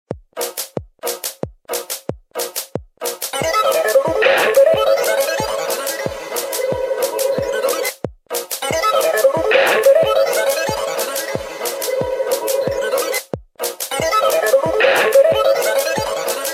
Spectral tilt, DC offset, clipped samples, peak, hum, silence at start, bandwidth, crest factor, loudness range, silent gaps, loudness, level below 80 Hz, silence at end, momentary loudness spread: -2 dB/octave; under 0.1%; under 0.1%; 0 dBFS; none; 0.1 s; 16.5 kHz; 16 dB; 5 LU; none; -17 LUFS; -48 dBFS; 0 s; 13 LU